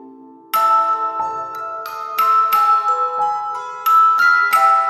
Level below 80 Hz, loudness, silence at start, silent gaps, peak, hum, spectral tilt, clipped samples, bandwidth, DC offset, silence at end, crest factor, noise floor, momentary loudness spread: -74 dBFS; -15 LUFS; 0 s; none; -4 dBFS; none; -1 dB/octave; under 0.1%; 15 kHz; under 0.1%; 0 s; 14 dB; -41 dBFS; 13 LU